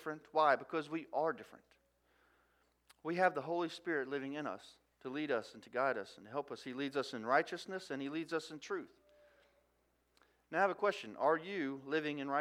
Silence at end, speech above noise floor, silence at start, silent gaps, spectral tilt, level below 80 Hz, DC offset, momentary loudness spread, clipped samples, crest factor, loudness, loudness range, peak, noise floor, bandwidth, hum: 0 s; 39 dB; 0 s; none; -5 dB/octave; -84 dBFS; under 0.1%; 11 LU; under 0.1%; 22 dB; -38 LUFS; 3 LU; -18 dBFS; -77 dBFS; 15 kHz; 60 Hz at -80 dBFS